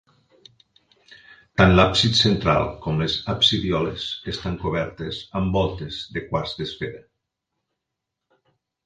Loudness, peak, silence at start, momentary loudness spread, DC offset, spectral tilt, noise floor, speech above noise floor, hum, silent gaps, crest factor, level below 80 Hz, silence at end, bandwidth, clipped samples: -22 LUFS; 0 dBFS; 1.1 s; 14 LU; under 0.1%; -5 dB/octave; -82 dBFS; 61 dB; none; none; 24 dB; -40 dBFS; 1.85 s; 9.6 kHz; under 0.1%